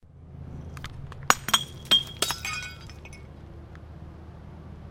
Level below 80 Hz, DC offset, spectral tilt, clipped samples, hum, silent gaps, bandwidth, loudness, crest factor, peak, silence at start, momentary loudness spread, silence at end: -48 dBFS; under 0.1%; -1.5 dB/octave; under 0.1%; none; none; 16.5 kHz; -24 LUFS; 32 dB; 0 dBFS; 0.05 s; 23 LU; 0 s